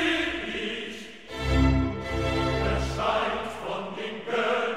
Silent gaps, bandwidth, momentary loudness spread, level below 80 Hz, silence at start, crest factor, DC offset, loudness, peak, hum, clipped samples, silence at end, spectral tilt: none; 12.5 kHz; 10 LU; -34 dBFS; 0 s; 16 dB; 0.3%; -28 LUFS; -10 dBFS; none; under 0.1%; 0 s; -5.5 dB/octave